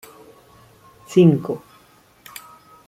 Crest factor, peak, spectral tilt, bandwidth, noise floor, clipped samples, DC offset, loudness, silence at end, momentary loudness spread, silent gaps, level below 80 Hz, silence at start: 20 dB; -2 dBFS; -8 dB/octave; 15.5 kHz; -53 dBFS; under 0.1%; under 0.1%; -18 LUFS; 1.3 s; 25 LU; none; -62 dBFS; 1.1 s